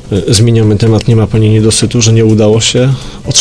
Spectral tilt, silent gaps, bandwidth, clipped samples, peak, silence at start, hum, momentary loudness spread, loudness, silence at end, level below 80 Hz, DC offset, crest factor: -5 dB/octave; none; 11 kHz; 0.3%; 0 dBFS; 0 s; none; 3 LU; -8 LUFS; 0 s; -30 dBFS; under 0.1%; 8 dB